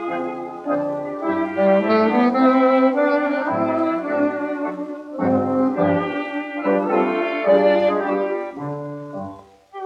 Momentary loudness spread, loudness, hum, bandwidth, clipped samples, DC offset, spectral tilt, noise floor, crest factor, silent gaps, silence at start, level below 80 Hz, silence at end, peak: 14 LU; -20 LUFS; none; 6.8 kHz; under 0.1%; under 0.1%; -8 dB/octave; -39 dBFS; 14 dB; none; 0 s; -68 dBFS; 0 s; -4 dBFS